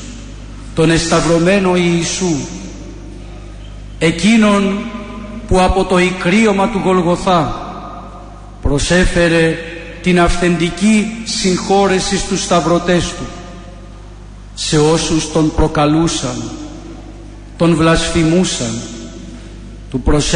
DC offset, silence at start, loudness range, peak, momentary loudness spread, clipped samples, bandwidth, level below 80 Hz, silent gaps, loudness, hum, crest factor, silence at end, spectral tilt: under 0.1%; 0 s; 3 LU; -2 dBFS; 21 LU; under 0.1%; 10.5 kHz; -28 dBFS; none; -14 LUFS; 50 Hz at -35 dBFS; 12 dB; 0 s; -5 dB/octave